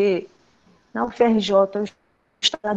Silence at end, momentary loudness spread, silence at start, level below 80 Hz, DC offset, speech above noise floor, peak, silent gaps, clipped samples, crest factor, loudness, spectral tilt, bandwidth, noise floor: 0 s; 12 LU; 0 s; -60 dBFS; under 0.1%; 38 dB; -4 dBFS; none; under 0.1%; 18 dB; -21 LUFS; -4.5 dB/octave; 8.6 kHz; -58 dBFS